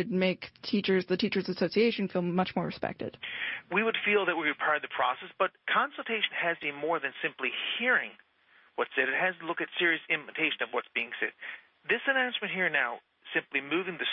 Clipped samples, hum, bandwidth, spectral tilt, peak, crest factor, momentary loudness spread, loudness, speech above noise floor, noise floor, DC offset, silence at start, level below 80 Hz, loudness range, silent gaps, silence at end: under 0.1%; none; 6 kHz; -8 dB/octave; -14 dBFS; 18 dB; 8 LU; -30 LUFS; 33 dB; -63 dBFS; under 0.1%; 0 s; -72 dBFS; 1 LU; none; 0 s